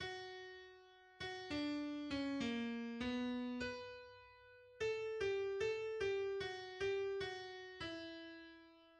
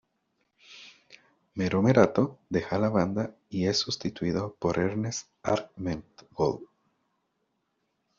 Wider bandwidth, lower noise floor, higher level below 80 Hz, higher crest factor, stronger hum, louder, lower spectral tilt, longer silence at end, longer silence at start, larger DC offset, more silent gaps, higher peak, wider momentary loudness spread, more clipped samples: first, 10 kHz vs 7.4 kHz; second, -64 dBFS vs -77 dBFS; second, -70 dBFS vs -60 dBFS; second, 14 dB vs 24 dB; neither; second, -44 LUFS vs -28 LUFS; about the same, -4.5 dB/octave vs -5.5 dB/octave; second, 0 s vs 1.55 s; second, 0 s vs 0.7 s; neither; neither; second, -30 dBFS vs -6 dBFS; about the same, 19 LU vs 17 LU; neither